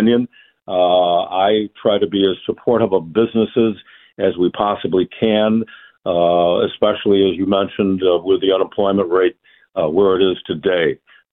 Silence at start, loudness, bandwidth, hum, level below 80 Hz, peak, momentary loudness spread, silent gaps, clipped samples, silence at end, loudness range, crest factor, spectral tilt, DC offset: 0 s; -17 LUFS; 4 kHz; none; -54 dBFS; -2 dBFS; 6 LU; none; under 0.1%; 0.35 s; 2 LU; 14 dB; -10 dB/octave; under 0.1%